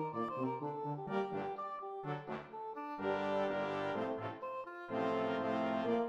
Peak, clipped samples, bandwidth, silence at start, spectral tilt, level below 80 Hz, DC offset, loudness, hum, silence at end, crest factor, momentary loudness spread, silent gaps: -24 dBFS; under 0.1%; 9.2 kHz; 0 s; -7.5 dB/octave; -78 dBFS; under 0.1%; -39 LUFS; none; 0 s; 16 dB; 8 LU; none